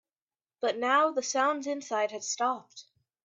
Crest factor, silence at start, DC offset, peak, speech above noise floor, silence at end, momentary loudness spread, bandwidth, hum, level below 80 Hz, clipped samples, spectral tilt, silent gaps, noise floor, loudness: 18 dB; 0.6 s; under 0.1%; -14 dBFS; over 61 dB; 0.4 s; 8 LU; 8.2 kHz; none; -84 dBFS; under 0.1%; -1 dB/octave; none; under -90 dBFS; -29 LUFS